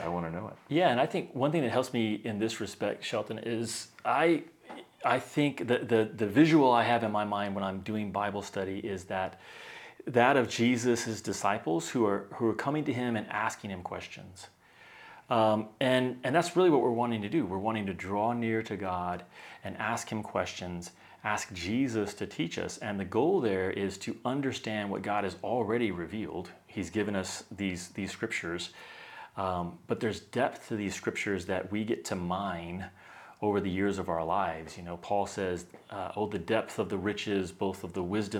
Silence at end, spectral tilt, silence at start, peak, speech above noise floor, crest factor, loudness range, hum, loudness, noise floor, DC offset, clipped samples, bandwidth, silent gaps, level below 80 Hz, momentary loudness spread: 0 s; -5.5 dB/octave; 0 s; -8 dBFS; 24 dB; 22 dB; 7 LU; none; -31 LUFS; -55 dBFS; under 0.1%; under 0.1%; 17 kHz; none; -66 dBFS; 14 LU